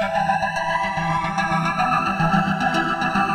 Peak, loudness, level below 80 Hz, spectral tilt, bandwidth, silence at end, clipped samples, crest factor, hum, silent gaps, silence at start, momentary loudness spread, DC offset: -8 dBFS; -21 LUFS; -44 dBFS; -5.5 dB/octave; 13.5 kHz; 0 s; under 0.1%; 14 dB; none; none; 0 s; 3 LU; 0.3%